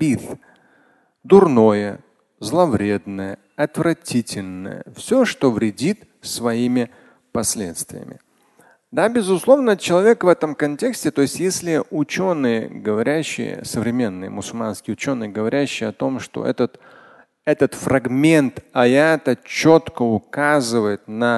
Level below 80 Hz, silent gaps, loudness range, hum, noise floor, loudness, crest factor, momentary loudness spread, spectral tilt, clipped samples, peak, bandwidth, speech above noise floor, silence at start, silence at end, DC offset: -54 dBFS; none; 6 LU; none; -58 dBFS; -19 LUFS; 18 dB; 14 LU; -5 dB/octave; under 0.1%; 0 dBFS; 12.5 kHz; 39 dB; 0 s; 0 s; under 0.1%